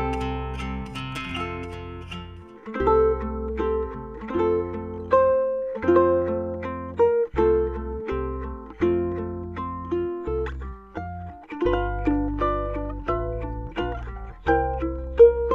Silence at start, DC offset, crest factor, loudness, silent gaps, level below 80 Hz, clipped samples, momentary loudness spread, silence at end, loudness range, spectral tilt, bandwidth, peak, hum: 0 s; under 0.1%; 20 dB; -25 LUFS; none; -36 dBFS; under 0.1%; 16 LU; 0 s; 6 LU; -8 dB/octave; 9.4 kHz; -4 dBFS; none